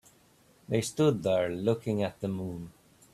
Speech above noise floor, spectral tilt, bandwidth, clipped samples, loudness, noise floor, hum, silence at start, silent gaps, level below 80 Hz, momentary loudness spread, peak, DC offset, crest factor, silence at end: 33 dB; -6 dB/octave; 14.5 kHz; under 0.1%; -30 LUFS; -62 dBFS; none; 0.7 s; none; -64 dBFS; 12 LU; -12 dBFS; under 0.1%; 18 dB; 0.45 s